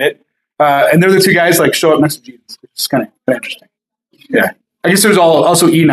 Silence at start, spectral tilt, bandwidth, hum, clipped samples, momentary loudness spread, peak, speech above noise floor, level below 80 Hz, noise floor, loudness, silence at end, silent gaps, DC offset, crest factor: 0 s; -4.5 dB/octave; 15.5 kHz; none; under 0.1%; 11 LU; 0 dBFS; 43 dB; -58 dBFS; -54 dBFS; -11 LUFS; 0 s; none; under 0.1%; 12 dB